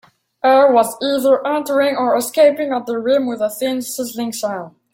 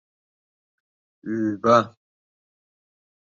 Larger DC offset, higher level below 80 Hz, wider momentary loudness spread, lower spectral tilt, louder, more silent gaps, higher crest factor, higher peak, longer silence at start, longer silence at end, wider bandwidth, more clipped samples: neither; about the same, -64 dBFS vs -68 dBFS; second, 11 LU vs 17 LU; second, -3.5 dB/octave vs -6.5 dB/octave; first, -16 LUFS vs -21 LUFS; neither; second, 14 dB vs 24 dB; about the same, -2 dBFS vs -4 dBFS; second, 0.45 s vs 1.25 s; second, 0.25 s vs 1.35 s; first, 17 kHz vs 7.4 kHz; neither